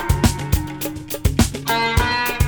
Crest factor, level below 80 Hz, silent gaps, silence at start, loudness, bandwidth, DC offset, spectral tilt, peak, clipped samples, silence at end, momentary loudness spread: 18 dB; -26 dBFS; none; 0 s; -20 LUFS; over 20 kHz; under 0.1%; -4.5 dB/octave; -2 dBFS; under 0.1%; 0 s; 8 LU